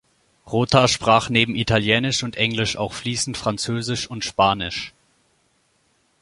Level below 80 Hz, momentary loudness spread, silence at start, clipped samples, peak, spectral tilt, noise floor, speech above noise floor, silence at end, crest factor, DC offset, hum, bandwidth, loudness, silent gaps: -46 dBFS; 9 LU; 0.45 s; under 0.1%; 0 dBFS; -4 dB/octave; -64 dBFS; 44 dB; 1.35 s; 22 dB; under 0.1%; none; 11.5 kHz; -20 LUFS; none